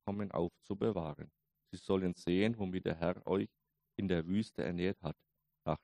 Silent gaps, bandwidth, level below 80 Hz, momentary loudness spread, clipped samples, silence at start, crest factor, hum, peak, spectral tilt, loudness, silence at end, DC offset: none; 11 kHz; -62 dBFS; 14 LU; under 0.1%; 0.05 s; 20 dB; none; -18 dBFS; -7.5 dB/octave; -37 LUFS; 0.05 s; under 0.1%